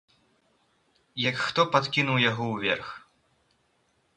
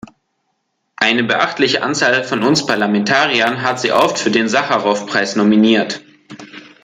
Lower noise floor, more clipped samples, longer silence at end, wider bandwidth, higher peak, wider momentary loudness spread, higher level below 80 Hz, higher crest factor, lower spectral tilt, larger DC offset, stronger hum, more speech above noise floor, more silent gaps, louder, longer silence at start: about the same, -70 dBFS vs -69 dBFS; neither; first, 1.2 s vs 0.25 s; second, 10.5 kHz vs 14.5 kHz; second, -4 dBFS vs 0 dBFS; first, 17 LU vs 5 LU; second, -66 dBFS vs -60 dBFS; first, 24 dB vs 16 dB; about the same, -5 dB/octave vs -4 dB/octave; neither; neither; second, 44 dB vs 54 dB; neither; second, -25 LUFS vs -14 LUFS; first, 1.15 s vs 1 s